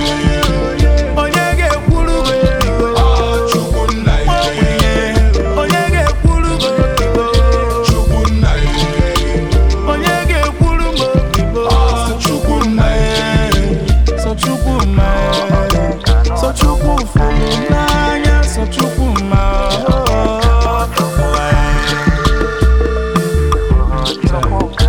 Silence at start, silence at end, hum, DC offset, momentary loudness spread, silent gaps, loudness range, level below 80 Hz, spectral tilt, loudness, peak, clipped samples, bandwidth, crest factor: 0 s; 0 s; none; under 0.1%; 3 LU; none; 1 LU; -14 dBFS; -5.5 dB/octave; -13 LUFS; 0 dBFS; under 0.1%; 18.5 kHz; 12 dB